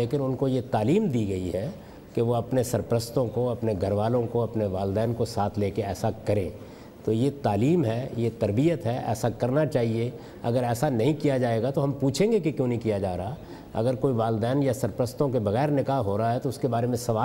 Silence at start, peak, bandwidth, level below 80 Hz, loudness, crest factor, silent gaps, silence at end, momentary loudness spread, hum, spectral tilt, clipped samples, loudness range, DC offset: 0 s; -12 dBFS; 16 kHz; -54 dBFS; -26 LUFS; 14 dB; none; 0 s; 6 LU; none; -7 dB/octave; under 0.1%; 2 LU; under 0.1%